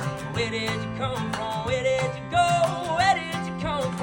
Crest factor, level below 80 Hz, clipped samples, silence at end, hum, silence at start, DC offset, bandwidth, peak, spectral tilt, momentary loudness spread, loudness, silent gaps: 16 dB; -48 dBFS; under 0.1%; 0 s; none; 0 s; under 0.1%; 17 kHz; -8 dBFS; -5 dB/octave; 7 LU; -25 LUFS; none